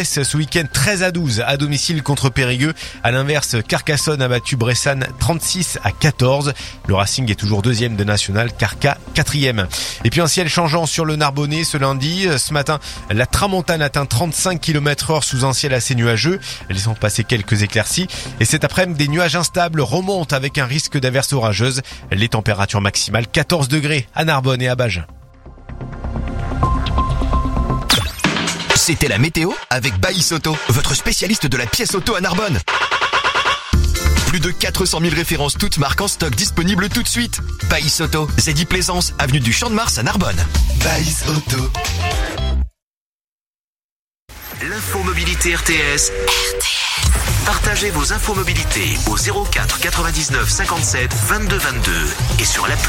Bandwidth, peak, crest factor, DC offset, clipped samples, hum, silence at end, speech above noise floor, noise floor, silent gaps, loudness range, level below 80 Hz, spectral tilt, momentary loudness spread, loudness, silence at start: 16.5 kHz; 0 dBFS; 16 dB; under 0.1%; under 0.1%; none; 0 s; over 73 dB; under -90 dBFS; 42.82-43.20 s, 43.32-43.73 s, 43.84-44.11 s, 44.22-44.26 s; 3 LU; -26 dBFS; -3.5 dB/octave; 4 LU; -17 LUFS; 0 s